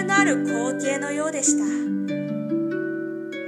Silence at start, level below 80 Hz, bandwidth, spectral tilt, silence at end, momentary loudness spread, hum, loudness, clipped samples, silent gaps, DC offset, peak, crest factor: 0 s; -78 dBFS; 12 kHz; -4 dB/octave; 0 s; 8 LU; none; -24 LUFS; under 0.1%; none; under 0.1%; -4 dBFS; 18 dB